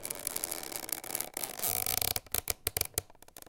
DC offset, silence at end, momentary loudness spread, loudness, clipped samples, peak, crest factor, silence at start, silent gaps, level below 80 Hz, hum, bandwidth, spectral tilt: under 0.1%; 0 s; 7 LU; -33 LUFS; under 0.1%; -6 dBFS; 30 dB; 0 s; none; -56 dBFS; none; 17.5 kHz; -1 dB/octave